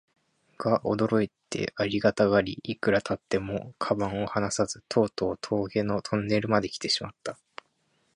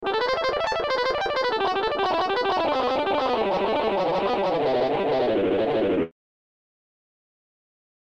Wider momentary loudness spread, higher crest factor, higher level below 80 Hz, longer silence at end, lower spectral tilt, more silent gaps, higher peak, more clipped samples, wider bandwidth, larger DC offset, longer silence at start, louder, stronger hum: first, 8 LU vs 1 LU; first, 22 dB vs 12 dB; about the same, -56 dBFS vs -54 dBFS; second, 0.8 s vs 1.95 s; about the same, -5 dB/octave vs -5 dB/octave; neither; first, -6 dBFS vs -12 dBFS; neither; first, 11 kHz vs 9 kHz; neither; first, 0.6 s vs 0 s; second, -28 LUFS vs -24 LUFS; neither